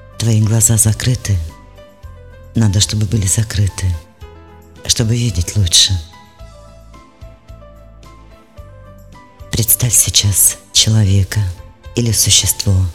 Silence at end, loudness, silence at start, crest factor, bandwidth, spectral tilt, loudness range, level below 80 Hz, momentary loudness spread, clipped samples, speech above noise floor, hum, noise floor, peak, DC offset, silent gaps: 0 s; -13 LUFS; 0.15 s; 16 dB; 16.5 kHz; -3 dB/octave; 6 LU; -34 dBFS; 13 LU; under 0.1%; 27 dB; none; -40 dBFS; 0 dBFS; 0.4%; none